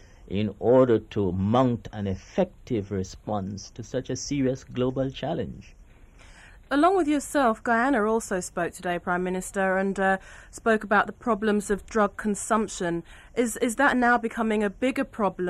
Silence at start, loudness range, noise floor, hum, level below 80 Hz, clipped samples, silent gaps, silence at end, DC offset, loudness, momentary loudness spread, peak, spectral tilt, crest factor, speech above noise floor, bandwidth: 0.2 s; 5 LU; -50 dBFS; none; -50 dBFS; under 0.1%; none; 0 s; under 0.1%; -26 LUFS; 11 LU; -8 dBFS; -5.5 dB/octave; 18 dB; 25 dB; 14 kHz